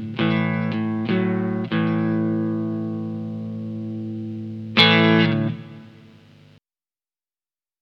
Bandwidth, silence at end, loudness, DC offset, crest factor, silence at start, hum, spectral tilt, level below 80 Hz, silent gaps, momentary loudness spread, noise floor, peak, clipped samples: 6.4 kHz; 1.8 s; -21 LUFS; under 0.1%; 22 dB; 0 s; none; -7.5 dB/octave; -70 dBFS; none; 15 LU; under -90 dBFS; 0 dBFS; under 0.1%